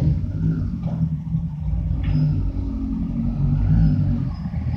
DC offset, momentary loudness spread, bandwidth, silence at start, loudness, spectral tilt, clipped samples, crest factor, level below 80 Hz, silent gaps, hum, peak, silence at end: under 0.1%; 8 LU; 5.4 kHz; 0 s; -23 LUFS; -11 dB/octave; under 0.1%; 14 dB; -28 dBFS; none; none; -6 dBFS; 0 s